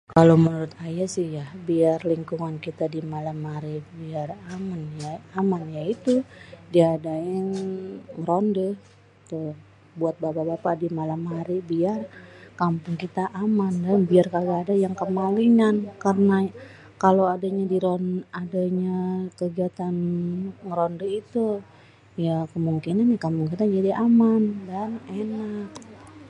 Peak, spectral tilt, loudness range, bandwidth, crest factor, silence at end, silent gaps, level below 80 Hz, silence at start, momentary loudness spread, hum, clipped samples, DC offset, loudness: -2 dBFS; -8 dB/octave; 7 LU; 11 kHz; 22 dB; 0 s; none; -62 dBFS; 0.1 s; 14 LU; none; under 0.1%; under 0.1%; -24 LUFS